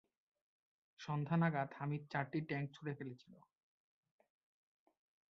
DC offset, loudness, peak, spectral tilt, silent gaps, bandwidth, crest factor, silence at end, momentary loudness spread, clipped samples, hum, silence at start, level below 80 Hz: under 0.1%; -41 LUFS; -22 dBFS; -6.5 dB/octave; none; 6.6 kHz; 22 dB; 1.95 s; 15 LU; under 0.1%; none; 1 s; -82 dBFS